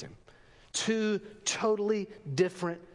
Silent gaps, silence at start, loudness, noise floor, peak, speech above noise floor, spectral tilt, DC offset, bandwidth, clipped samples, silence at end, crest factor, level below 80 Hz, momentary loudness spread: none; 0 s; -31 LUFS; -58 dBFS; -14 dBFS; 27 dB; -4 dB/octave; under 0.1%; 11.5 kHz; under 0.1%; 0.1 s; 18 dB; -66 dBFS; 8 LU